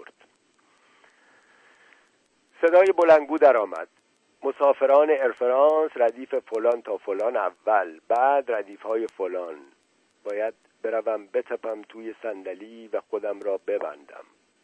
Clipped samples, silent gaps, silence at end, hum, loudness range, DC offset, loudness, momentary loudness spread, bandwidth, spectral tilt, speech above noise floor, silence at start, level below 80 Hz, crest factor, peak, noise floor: under 0.1%; none; 0.4 s; none; 11 LU; under 0.1%; -23 LUFS; 18 LU; 9.4 kHz; -5 dB/octave; 43 dB; 2.6 s; -78 dBFS; 18 dB; -6 dBFS; -66 dBFS